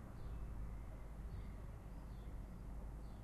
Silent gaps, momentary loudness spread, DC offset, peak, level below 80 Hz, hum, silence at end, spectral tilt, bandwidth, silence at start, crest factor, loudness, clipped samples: none; 3 LU; under 0.1%; -38 dBFS; -50 dBFS; none; 0 s; -7.5 dB/octave; 13 kHz; 0 s; 12 dB; -53 LUFS; under 0.1%